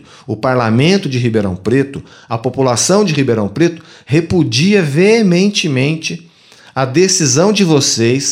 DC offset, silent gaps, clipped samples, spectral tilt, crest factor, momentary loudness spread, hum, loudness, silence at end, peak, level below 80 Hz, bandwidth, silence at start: under 0.1%; none; under 0.1%; -4.5 dB/octave; 12 dB; 11 LU; none; -13 LUFS; 0 s; 0 dBFS; -48 dBFS; 16 kHz; 0.3 s